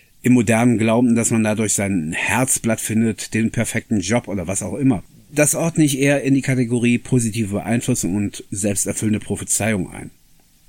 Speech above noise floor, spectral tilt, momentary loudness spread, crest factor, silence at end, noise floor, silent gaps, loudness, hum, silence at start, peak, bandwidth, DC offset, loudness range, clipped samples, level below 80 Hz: 34 dB; -5 dB/octave; 8 LU; 18 dB; 0.6 s; -52 dBFS; none; -19 LUFS; none; 0.25 s; -2 dBFS; 17 kHz; under 0.1%; 3 LU; under 0.1%; -48 dBFS